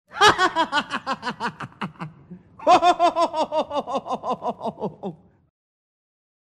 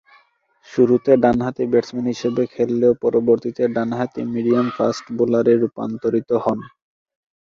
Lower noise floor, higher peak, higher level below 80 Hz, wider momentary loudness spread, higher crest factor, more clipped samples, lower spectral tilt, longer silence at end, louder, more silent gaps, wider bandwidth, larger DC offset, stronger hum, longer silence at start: second, -45 dBFS vs -57 dBFS; about the same, -2 dBFS vs -2 dBFS; about the same, -58 dBFS vs -56 dBFS; first, 17 LU vs 8 LU; about the same, 22 dB vs 18 dB; neither; second, -3.5 dB/octave vs -7.5 dB/octave; first, 1.25 s vs 0.8 s; second, -22 LUFS vs -19 LUFS; neither; first, 13 kHz vs 7.4 kHz; neither; neither; second, 0.15 s vs 0.7 s